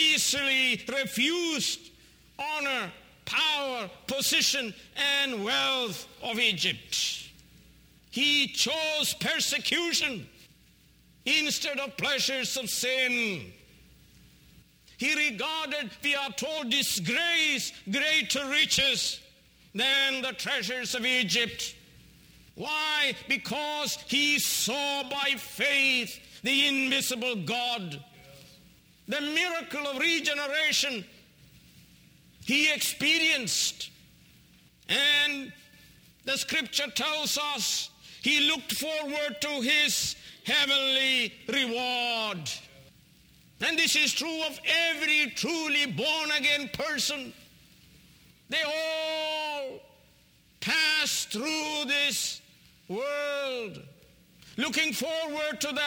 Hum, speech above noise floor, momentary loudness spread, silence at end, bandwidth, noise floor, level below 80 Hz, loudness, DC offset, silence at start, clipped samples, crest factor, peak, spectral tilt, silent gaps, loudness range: none; 33 dB; 11 LU; 0 s; over 20 kHz; -61 dBFS; -66 dBFS; -26 LUFS; under 0.1%; 0 s; under 0.1%; 20 dB; -10 dBFS; -1 dB/octave; none; 4 LU